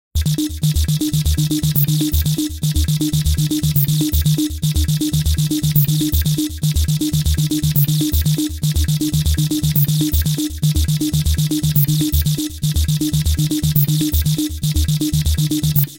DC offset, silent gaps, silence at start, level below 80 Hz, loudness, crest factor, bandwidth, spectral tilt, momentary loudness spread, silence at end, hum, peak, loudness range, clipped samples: under 0.1%; none; 0.15 s; -24 dBFS; -17 LUFS; 16 dB; 17.5 kHz; -5 dB/octave; 4 LU; 0 s; none; 0 dBFS; 1 LU; under 0.1%